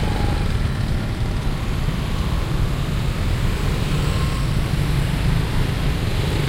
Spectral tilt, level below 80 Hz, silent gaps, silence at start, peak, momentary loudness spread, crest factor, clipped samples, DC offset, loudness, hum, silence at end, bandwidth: -6 dB/octave; -24 dBFS; none; 0 s; -8 dBFS; 3 LU; 12 dB; under 0.1%; under 0.1%; -22 LUFS; none; 0 s; 16 kHz